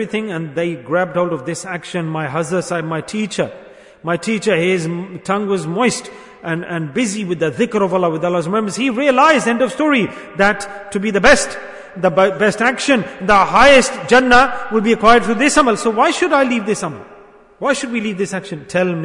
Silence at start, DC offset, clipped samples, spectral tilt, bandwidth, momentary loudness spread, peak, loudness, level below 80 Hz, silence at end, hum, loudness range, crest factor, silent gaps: 0 s; under 0.1%; under 0.1%; -4.5 dB/octave; 11 kHz; 13 LU; 0 dBFS; -16 LUFS; -42 dBFS; 0 s; none; 8 LU; 16 dB; none